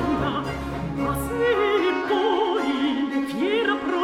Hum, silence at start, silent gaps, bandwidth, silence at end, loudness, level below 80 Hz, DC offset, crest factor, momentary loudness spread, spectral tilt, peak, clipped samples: none; 0 s; none; 16 kHz; 0 s; -23 LUFS; -42 dBFS; under 0.1%; 14 dB; 6 LU; -5.5 dB/octave; -10 dBFS; under 0.1%